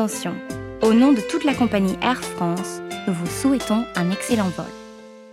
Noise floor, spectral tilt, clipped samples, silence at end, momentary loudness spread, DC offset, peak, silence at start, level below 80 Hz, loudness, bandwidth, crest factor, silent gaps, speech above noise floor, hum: -41 dBFS; -5.5 dB/octave; under 0.1%; 0 s; 15 LU; under 0.1%; -4 dBFS; 0 s; -50 dBFS; -21 LUFS; 16 kHz; 18 dB; none; 21 dB; none